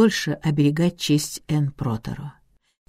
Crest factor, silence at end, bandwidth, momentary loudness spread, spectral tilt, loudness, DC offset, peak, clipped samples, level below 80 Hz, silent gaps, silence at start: 18 dB; 0.55 s; 16 kHz; 13 LU; -5.5 dB/octave; -23 LUFS; under 0.1%; -4 dBFS; under 0.1%; -50 dBFS; none; 0 s